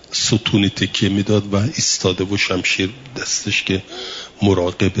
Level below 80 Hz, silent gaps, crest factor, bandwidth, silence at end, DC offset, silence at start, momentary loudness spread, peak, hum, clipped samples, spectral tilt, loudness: -50 dBFS; none; 16 dB; 7.8 kHz; 0 s; under 0.1%; 0.1 s; 7 LU; -2 dBFS; none; under 0.1%; -4 dB/octave; -18 LUFS